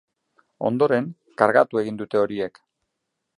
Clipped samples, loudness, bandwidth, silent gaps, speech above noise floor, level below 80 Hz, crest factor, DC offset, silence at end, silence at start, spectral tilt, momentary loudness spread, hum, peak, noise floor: under 0.1%; -22 LUFS; 11 kHz; none; 58 dB; -68 dBFS; 22 dB; under 0.1%; 0.9 s; 0.6 s; -7.5 dB/octave; 12 LU; none; -2 dBFS; -79 dBFS